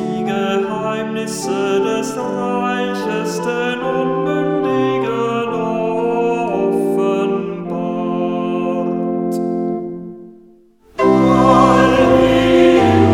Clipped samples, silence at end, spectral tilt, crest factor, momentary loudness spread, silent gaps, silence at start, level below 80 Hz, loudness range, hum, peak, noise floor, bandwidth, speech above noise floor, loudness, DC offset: under 0.1%; 0 s; -6 dB/octave; 16 dB; 10 LU; none; 0 s; -42 dBFS; 6 LU; none; 0 dBFS; -47 dBFS; 16 kHz; 29 dB; -16 LUFS; under 0.1%